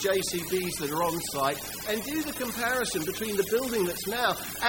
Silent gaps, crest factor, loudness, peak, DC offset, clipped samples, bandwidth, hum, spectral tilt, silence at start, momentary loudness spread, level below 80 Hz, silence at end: none; 20 dB; -29 LUFS; -8 dBFS; under 0.1%; under 0.1%; 17 kHz; 50 Hz at -55 dBFS; -3 dB/octave; 0 s; 4 LU; -54 dBFS; 0 s